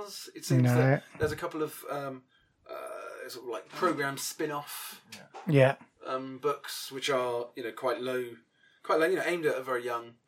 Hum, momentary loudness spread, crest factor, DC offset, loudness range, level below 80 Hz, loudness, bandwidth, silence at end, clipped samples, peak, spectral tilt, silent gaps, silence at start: none; 17 LU; 22 dB; under 0.1%; 5 LU; -66 dBFS; -31 LUFS; 17 kHz; 0.15 s; under 0.1%; -10 dBFS; -5.5 dB/octave; none; 0 s